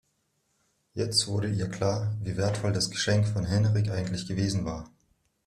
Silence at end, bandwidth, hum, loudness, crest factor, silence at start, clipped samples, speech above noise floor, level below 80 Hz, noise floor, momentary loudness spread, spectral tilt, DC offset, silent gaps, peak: 0.6 s; 13 kHz; none; -28 LUFS; 18 dB; 0.95 s; under 0.1%; 47 dB; -54 dBFS; -74 dBFS; 7 LU; -5 dB/octave; under 0.1%; none; -10 dBFS